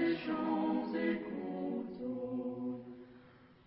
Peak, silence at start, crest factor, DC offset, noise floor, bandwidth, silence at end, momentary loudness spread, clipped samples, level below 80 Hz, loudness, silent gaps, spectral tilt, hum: -22 dBFS; 0 s; 14 dB; under 0.1%; -60 dBFS; 5.6 kHz; 0.15 s; 13 LU; under 0.1%; -72 dBFS; -38 LUFS; none; -5 dB/octave; none